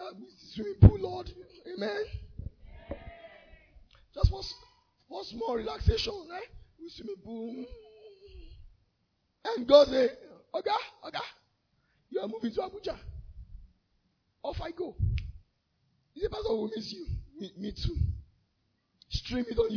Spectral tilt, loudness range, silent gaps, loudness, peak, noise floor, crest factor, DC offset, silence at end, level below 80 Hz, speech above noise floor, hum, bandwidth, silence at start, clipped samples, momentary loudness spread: -6 dB/octave; 11 LU; none; -31 LUFS; -8 dBFS; -76 dBFS; 24 dB; under 0.1%; 0 s; -40 dBFS; 47 dB; none; 5.4 kHz; 0 s; under 0.1%; 24 LU